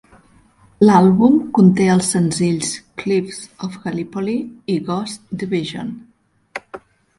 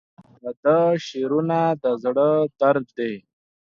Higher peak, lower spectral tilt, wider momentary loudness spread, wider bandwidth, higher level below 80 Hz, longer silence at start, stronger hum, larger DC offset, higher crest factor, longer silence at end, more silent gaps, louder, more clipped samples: first, 0 dBFS vs -6 dBFS; second, -6 dB/octave vs -7.5 dB/octave; first, 19 LU vs 11 LU; first, 11.5 kHz vs 7.2 kHz; first, -54 dBFS vs -68 dBFS; first, 0.8 s vs 0.45 s; neither; neither; about the same, 18 dB vs 16 dB; second, 0.4 s vs 0.6 s; second, none vs 0.57-0.63 s; first, -17 LUFS vs -21 LUFS; neither